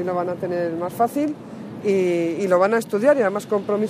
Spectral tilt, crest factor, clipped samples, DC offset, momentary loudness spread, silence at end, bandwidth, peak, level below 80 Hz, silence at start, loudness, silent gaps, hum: -6.5 dB/octave; 16 dB; under 0.1%; under 0.1%; 9 LU; 0 s; 15.5 kHz; -4 dBFS; -68 dBFS; 0 s; -21 LUFS; none; none